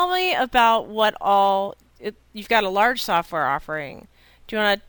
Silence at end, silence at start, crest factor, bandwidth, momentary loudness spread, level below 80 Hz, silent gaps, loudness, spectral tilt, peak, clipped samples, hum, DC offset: 0.1 s; 0 s; 18 dB; over 20 kHz; 17 LU; -52 dBFS; none; -20 LUFS; -3.5 dB/octave; -4 dBFS; under 0.1%; none; under 0.1%